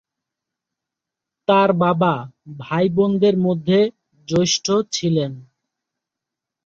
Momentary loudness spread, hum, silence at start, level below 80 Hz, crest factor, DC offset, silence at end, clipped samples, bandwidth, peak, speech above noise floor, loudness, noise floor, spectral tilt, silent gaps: 11 LU; none; 1.5 s; -58 dBFS; 18 dB; under 0.1%; 1.25 s; under 0.1%; 7.6 kHz; -2 dBFS; 67 dB; -19 LUFS; -85 dBFS; -5.5 dB/octave; none